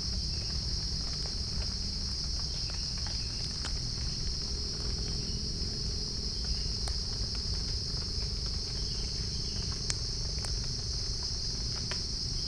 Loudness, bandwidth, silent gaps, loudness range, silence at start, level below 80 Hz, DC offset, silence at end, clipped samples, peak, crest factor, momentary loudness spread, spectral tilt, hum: -33 LUFS; 10.5 kHz; none; 0 LU; 0 s; -38 dBFS; under 0.1%; 0 s; under 0.1%; -8 dBFS; 26 dB; 1 LU; -3 dB/octave; none